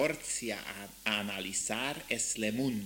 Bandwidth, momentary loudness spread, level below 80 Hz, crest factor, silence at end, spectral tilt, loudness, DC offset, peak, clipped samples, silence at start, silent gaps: 17 kHz; 6 LU; -64 dBFS; 20 dB; 0 s; -2.5 dB/octave; -34 LUFS; under 0.1%; -14 dBFS; under 0.1%; 0 s; none